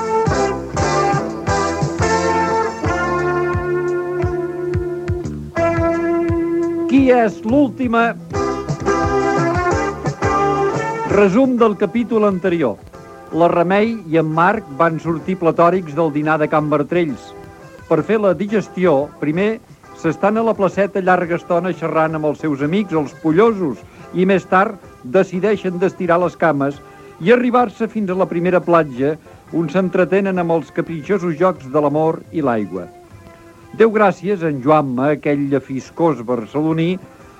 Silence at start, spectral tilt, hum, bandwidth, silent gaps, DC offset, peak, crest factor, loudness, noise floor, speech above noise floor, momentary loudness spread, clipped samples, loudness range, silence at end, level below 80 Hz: 0 s; -7 dB/octave; none; 11 kHz; none; under 0.1%; 0 dBFS; 16 dB; -17 LUFS; -41 dBFS; 25 dB; 8 LU; under 0.1%; 2 LU; 0.35 s; -40 dBFS